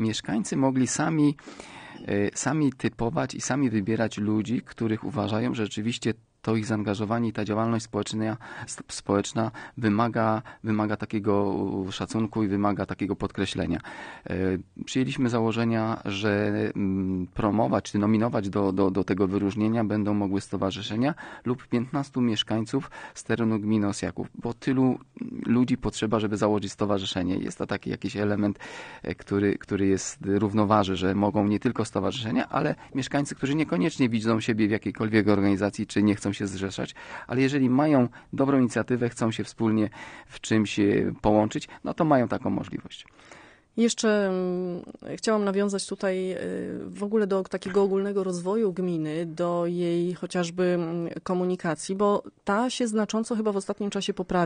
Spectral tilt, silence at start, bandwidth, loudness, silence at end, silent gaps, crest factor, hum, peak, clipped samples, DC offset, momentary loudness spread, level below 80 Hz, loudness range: -6 dB/octave; 0 s; 10 kHz; -26 LUFS; 0 s; none; 20 dB; none; -6 dBFS; under 0.1%; under 0.1%; 8 LU; -56 dBFS; 3 LU